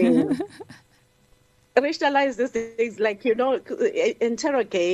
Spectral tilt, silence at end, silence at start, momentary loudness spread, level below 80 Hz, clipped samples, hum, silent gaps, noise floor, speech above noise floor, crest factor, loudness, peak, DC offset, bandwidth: -4.5 dB/octave; 0 s; 0 s; 6 LU; -66 dBFS; under 0.1%; none; none; -59 dBFS; 36 dB; 18 dB; -23 LUFS; -4 dBFS; under 0.1%; 11 kHz